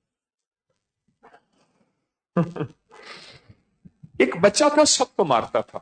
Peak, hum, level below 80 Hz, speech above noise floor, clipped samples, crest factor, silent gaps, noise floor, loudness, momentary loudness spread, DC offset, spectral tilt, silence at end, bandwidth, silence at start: -6 dBFS; none; -62 dBFS; 58 dB; under 0.1%; 20 dB; none; -78 dBFS; -20 LUFS; 24 LU; under 0.1%; -3.5 dB/octave; 0.05 s; 9.4 kHz; 2.35 s